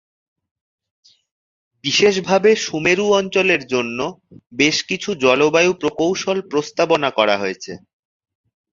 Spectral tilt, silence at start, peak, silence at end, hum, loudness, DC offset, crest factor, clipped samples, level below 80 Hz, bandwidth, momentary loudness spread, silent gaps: -3.5 dB/octave; 1.85 s; 0 dBFS; 0.95 s; none; -17 LUFS; under 0.1%; 18 dB; under 0.1%; -60 dBFS; 7.6 kHz; 11 LU; none